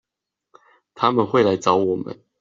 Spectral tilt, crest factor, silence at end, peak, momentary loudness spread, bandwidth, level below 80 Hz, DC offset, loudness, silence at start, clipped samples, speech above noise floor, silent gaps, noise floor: -5 dB/octave; 20 dB; 0.25 s; -2 dBFS; 9 LU; 7.6 kHz; -62 dBFS; under 0.1%; -19 LUFS; 0.95 s; under 0.1%; 65 dB; none; -84 dBFS